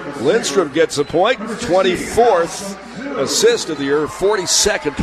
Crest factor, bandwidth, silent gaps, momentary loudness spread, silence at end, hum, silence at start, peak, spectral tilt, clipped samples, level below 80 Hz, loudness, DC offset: 14 dB; 14 kHz; none; 9 LU; 0 s; none; 0 s; -2 dBFS; -3 dB/octave; under 0.1%; -44 dBFS; -16 LUFS; under 0.1%